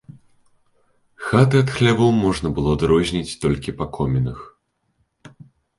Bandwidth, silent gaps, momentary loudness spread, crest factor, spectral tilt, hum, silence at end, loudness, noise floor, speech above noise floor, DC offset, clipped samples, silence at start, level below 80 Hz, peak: 11.5 kHz; none; 11 LU; 20 dB; -6.5 dB/octave; none; 0.5 s; -19 LUFS; -68 dBFS; 50 dB; under 0.1%; under 0.1%; 1.2 s; -40 dBFS; -2 dBFS